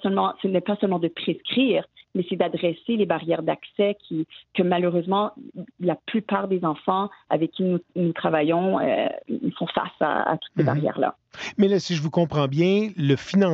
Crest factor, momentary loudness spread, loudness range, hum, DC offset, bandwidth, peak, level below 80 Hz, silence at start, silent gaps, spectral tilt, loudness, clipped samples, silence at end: 16 dB; 7 LU; 2 LU; none; under 0.1%; 7.6 kHz; -6 dBFS; -66 dBFS; 0 s; none; -7 dB/octave; -24 LUFS; under 0.1%; 0 s